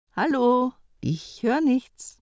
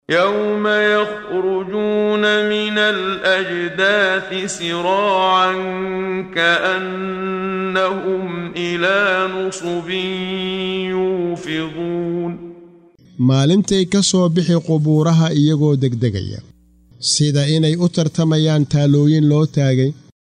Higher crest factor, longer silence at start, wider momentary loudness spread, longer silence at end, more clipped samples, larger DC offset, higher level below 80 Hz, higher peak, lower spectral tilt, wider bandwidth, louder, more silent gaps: about the same, 14 dB vs 14 dB; about the same, 0.15 s vs 0.1 s; about the same, 10 LU vs 8 LU; second, 0.15 s vs 0.4 s; neither; neither; second, -60 dBFS vs -52 dBFS; second, -10 dBFS vs -2 dBFS; first, -6.5 dB/octave vs -5 dB/octave; second, 8 kHz vs 10.5 kHz; second, -24 LUFS vs -17 LUFS; neither